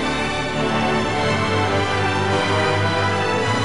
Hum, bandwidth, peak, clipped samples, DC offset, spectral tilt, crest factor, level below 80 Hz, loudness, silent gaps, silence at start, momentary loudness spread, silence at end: none; 11.5 kHz; -8 dBFS; under 0.1%; 1%; -5 dB/octave; 12 dB; -44 dBFS; -19 LUFS; none; 0 s; 3 LU; 0 s